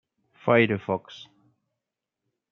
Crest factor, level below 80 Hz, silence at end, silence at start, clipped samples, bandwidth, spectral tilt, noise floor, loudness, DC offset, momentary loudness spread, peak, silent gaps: 24 dB; -72 dBFS; 1.3 s; 0.45 s; under 0.1%; 6.8 kHz; -4.5 dB/octave; -86 dBFS; -24 LUFS; under 0.1%; 24 LU; -6 dBFS; none